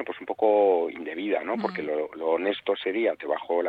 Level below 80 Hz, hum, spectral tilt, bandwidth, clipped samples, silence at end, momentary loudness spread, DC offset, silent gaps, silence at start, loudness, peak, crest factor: -74 dBFS; none; -7 dB/octave; 5 kHz; under 0.1%; 0 s; 9 LU; under 0.1%; none; 0 s; -26 LUFS; -10 dBFS; 16 dB